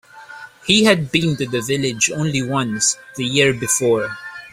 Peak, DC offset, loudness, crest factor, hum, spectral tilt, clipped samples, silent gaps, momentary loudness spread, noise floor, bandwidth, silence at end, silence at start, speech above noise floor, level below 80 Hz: 0 dBFS; under 0.1%; -17 LUFS; 18 dB; none; -3.5 dB/octave; under 0.1%; none; 13 LU; -38 dBFS; 16 kHz; 0.05 s; 0.15 s; 20 dB; -52 dBFS